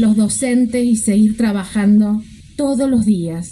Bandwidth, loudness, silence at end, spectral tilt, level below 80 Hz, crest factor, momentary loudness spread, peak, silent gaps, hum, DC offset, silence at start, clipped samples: 12.5 kHz; -15 LUFS; 0 s; -6 dB/octave; -42 dBFS; 10 dB; 6 LU; -4 dBFS; none; none; under 0.1%; 0 s; under 0.1%